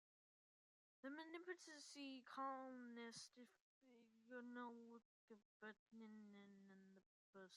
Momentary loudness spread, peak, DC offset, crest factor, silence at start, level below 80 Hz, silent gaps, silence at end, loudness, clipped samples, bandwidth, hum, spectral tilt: 14 LU; -40 dBFS; under 0.1%; 20 dB; 1.05 s; under -90 dBFS; 3.61-3.81 s, 5.05-5.28 s, 5.45-5.60 s, 5.79-5.86 s, 7.06-7.33 s; 0 s; -58 LUFS; under 0.1%; 11.5 kHz; none; -3 dB/octave